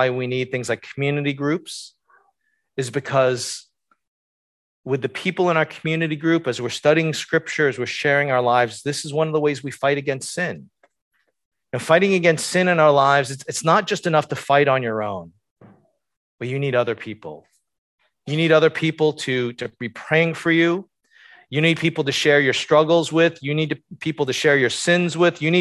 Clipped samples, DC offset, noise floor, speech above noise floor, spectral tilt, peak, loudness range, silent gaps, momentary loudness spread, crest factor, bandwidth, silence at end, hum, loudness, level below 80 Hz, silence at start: under 0.1%; under 0.1%; -69 dBFS; 49 dB; -5 dB/octave; -2 dBFS; 7 LU; 4.07-4.83 s, 11.02-11.11 s, 11.45-11.51 s, 15.51-15.56 s, 16.17-16.38 s, 17.78-17.98 s; 12 LU; 20 dB; 12.5 kHz; 0 s; none; -20 LUFS; -64 dBFS; 0 s